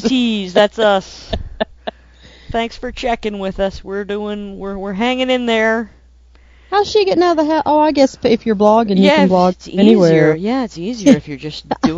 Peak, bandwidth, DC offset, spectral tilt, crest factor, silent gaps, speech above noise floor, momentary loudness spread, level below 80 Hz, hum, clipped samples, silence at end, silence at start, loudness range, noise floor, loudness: 0 dBFS; 7.8 kHz; under 0.1%; -6 dB/octave; 14 dB; none; 31 dB; 14 LU; -38 dBFS; none; under 0.1%; 0 s; 0 s; 10 LU; -46 dBFS; -15 LUFS